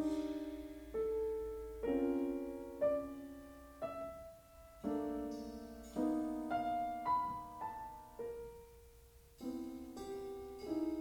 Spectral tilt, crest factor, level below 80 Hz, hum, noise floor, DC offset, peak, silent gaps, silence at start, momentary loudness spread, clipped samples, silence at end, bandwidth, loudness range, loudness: -6.5 dB/octave; 16 dB; -62 dBFS; none; -62 dBFS; under 0.1%; -26 dBFS; none; 0 s; 15 LU; under 0.1%; 0 s; over 20 kHz; 6 LU; -42 LUFS